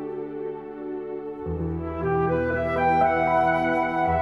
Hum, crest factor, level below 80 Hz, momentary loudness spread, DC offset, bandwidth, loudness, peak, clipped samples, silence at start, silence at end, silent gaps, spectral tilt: none; 14 dB; -44 dBFS; 13 LU; under 0.1%; 7 kHz; -25 LUFS; -10 dBFS; under 0.1%; 0 s; 0 s; none; -8.5 dB/octave